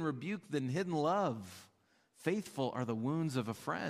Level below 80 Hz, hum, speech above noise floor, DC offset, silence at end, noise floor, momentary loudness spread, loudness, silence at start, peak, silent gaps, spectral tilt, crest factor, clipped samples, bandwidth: -80 dBFS; none; 35 dB; under 0.1%; 0 s; -71 dBFS; 8 LU; -37 LUFS; 0 s; -20 dBFS; none; -6.5 dB/octave; 18 dB; under 0.1%; 15.5 kHz